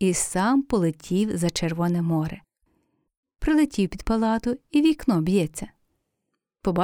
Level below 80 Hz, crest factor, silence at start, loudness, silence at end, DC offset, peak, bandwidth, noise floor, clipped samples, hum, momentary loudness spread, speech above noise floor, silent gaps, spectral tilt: -42 dBFS; 14 dB; 0 s; -24 LUFS; 0 s; under 0.1%; -10 dBFS; 18.5 kHz; -80 dBFS; under 0.1%; none; 9 LU; 57 dB; 3.17-3.23 s; -5.5 dB/octave